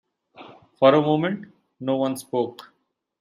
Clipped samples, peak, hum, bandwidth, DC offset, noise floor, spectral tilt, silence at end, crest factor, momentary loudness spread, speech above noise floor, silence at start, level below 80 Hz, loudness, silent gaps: under 0.1%; -2 dBFS; none; 15.5 kHz; under 0.1%; -47 dBFS; -6.5 dB/octave; 0.65 s; 22 dB; 14 LU; 26 dB; 0.4 s; -70 dBFS; -22 LUFS; none